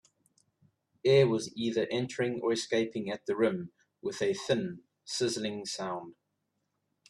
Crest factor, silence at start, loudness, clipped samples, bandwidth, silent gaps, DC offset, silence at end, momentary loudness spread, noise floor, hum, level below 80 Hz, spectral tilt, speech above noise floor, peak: 20 dB; 1.05 s; -31 LUFS; under 0.1%; 12 kHz; none; under 0.1%; 0.95 s; 15 LU; -81 dBFS; none; -72 dBFS; -5 dB/octave; 51 dB; -12 dBFS